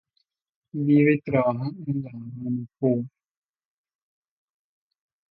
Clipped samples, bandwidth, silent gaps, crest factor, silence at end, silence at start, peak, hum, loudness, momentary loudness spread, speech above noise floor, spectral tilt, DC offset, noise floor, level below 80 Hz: under 0.1%; 4.6 kHz; none; 18 dB; 2.25 s; 0.75 s; -8 dBFS; none; -24 LUFS; 16 LU; 51 dB; -12.5 dB/octave; under 0.1%; -75 dBFS; -66 dBFS